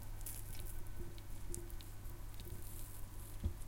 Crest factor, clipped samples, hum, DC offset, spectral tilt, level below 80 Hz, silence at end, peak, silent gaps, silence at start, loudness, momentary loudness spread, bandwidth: 24 dB; under 0.1%; none; under 0.1%; -4.5 dB/octave; -48 dBFS; 0 s; -22 dBFS; none; 0 s; -50 LUFS; 5 LU; 17 kHz